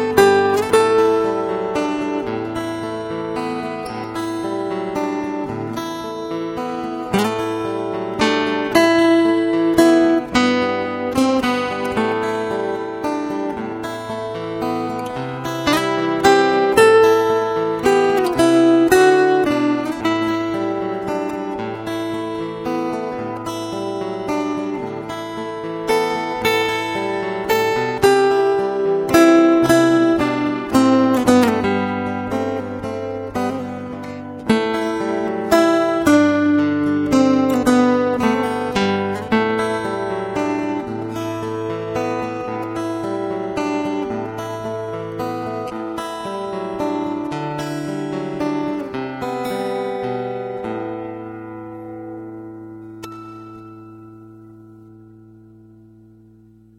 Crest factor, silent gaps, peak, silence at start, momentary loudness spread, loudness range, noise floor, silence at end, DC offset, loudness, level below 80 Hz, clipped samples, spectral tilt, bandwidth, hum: 18 dB; none; 0 dBFS; 0 s; 13 LU; 10 LU; -48 dBFS; 1.7 s; under 0.1%; -19 LUFS; -50 dBFS; under 0.1%; -5 dB/octave; 17 kHz; none